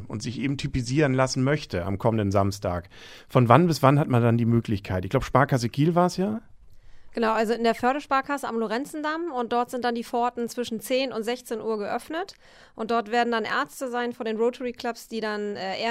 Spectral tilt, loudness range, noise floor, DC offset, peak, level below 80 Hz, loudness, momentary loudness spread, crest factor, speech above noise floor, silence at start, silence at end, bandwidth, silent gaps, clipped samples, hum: -6 dB/octave; 6 LU; -44 dBFS; under 0.1%; 0 dBFS; -50 dBFS; -25 LUFS; 10 LU; 24 dB; 20 dB; 0 s; 0 s; 16 kHz; none; under 0.1%; none